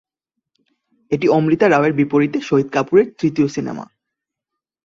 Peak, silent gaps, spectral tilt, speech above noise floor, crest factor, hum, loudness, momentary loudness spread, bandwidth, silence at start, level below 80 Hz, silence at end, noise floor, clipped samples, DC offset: -2 dBFS; none; -7 dB/octave; 67 dB; 16 dB; none; -17 LUFS; 11 LU; 7.4 kHz; 1.1 s; -58 dBFS; 1 s; -83 dBFS; under 0.1%; under 0.1%